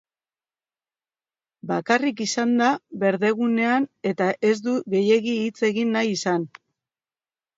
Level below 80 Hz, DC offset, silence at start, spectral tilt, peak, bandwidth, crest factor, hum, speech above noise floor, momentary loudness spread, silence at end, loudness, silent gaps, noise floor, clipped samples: -74 dBFS; under 0.1%; 1.65 s; -5 dB/octave; -4 dBFS; 8 kHz; 20 dB; none; over 68 dB; 7 LU; 1.1 s; -22 LUFS; none; under -90 dBFS; under 0.1%